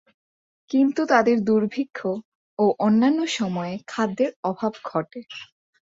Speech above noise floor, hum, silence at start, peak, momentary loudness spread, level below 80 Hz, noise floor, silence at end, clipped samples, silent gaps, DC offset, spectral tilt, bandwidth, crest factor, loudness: over 68 dB; none; 0.7 s; -4 dBFS; 15 LU; -68 dBFS; under -90 dBFS; 0.5 s; under 0.1%; 2.25-2.57 s, 4.36-4.43 s; under 0.1%; -6 dB/octave; 7.8 kHz; 20 dB; -23 LUFS